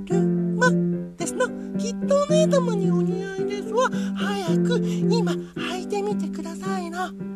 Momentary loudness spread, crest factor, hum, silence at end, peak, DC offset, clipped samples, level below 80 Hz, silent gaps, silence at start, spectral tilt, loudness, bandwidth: 9 LU; 16 dB; none; 0 s; -6 dBFS; under 0.1%; under 0.1%; -58 dBFS; none; 0 s; -6 dB/octave; -24 LUFS; 12 kHz